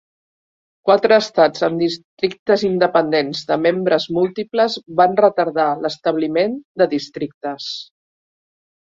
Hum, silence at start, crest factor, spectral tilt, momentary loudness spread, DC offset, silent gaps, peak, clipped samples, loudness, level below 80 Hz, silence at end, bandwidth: none; 0.85 s; 16 dB; -5.5 dB/octave; 11 LU; under 0.1%; 2.04-2.17 s, 2.39-2.46 s, 6.65-6.75 s, 7.34-7.41 s; -2 dBFS; under 0.1%; -18 LUFS; -62 dBFS; 1 s; 7.8 kHz